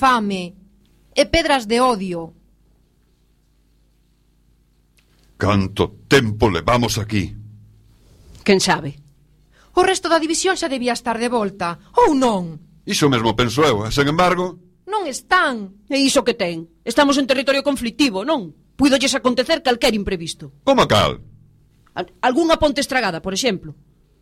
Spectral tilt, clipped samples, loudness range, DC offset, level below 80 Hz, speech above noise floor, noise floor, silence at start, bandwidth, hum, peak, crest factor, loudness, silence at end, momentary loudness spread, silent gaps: -4 dB/octave; under 0.1%; 4 LU; under 0.1%; -42 dBFS; 41 dB; -58 dBFS; 0 s; 16 kHz; 60 Hz at -50 dBFS; -2 dBFS; 18 dB; -18 LUFS; 0.5 s; 11 LU; none